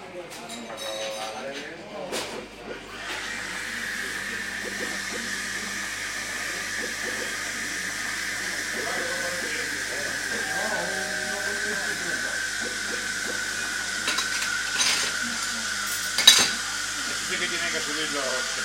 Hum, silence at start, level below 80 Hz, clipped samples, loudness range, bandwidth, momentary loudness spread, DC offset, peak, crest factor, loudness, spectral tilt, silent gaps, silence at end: none; 0 s; -56 dBFS; under 0.1%; 10 LU; 16.5 kHz; 10 LU; under 0.1%; 0 dBFS; 28 dB; -26 LUFS; 0 dB/octave; none; 0 s